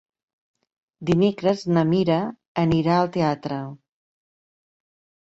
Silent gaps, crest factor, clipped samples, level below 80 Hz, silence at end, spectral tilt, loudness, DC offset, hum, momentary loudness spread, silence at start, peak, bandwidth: 2.48-2.55 s; 16 dB; under 0.1%; -54 dBFS; 1.55 s; -8 dB/octave; -22 LUFS; under 0.1%; none; 11 LU; 1 s; -8 dBFS; 7.8 kHz